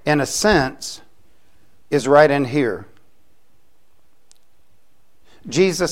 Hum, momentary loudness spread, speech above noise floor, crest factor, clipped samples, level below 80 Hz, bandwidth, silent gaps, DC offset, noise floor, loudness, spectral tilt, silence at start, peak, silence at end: none; 18 LU; 47 dB; 20 dB; under 0.1%; -46 dBFS; 16.5 kHz; none; 0.8%; -64 dBFS; -17 LUFS; -4.5 dB/octave; 0.05 s; 0 dBFS; 0 s